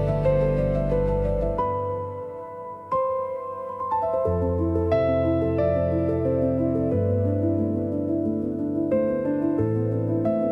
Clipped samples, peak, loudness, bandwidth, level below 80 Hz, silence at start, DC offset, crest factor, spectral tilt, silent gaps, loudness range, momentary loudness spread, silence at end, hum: under 0.1%; -10 dBFS; -24 LUFS; 5.8 kHz; -38 dBFS; 0 s; under 0.1%; 14 dB; -11 dB/octave; none; 4 LU; 8 LU; 0 s; none